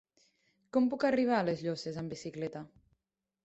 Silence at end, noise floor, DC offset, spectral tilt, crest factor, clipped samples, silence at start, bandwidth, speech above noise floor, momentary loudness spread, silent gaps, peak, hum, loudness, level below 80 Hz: 0.75 s; -88 dBFS; under 0.1%; -6.5 dB/octave; 18 dB; under 0.1%; 0.75 s; 8.2 kHz; 55 dB; 12 LU; none; -16 dBFS; none; -33 LUFS; -72 dBFS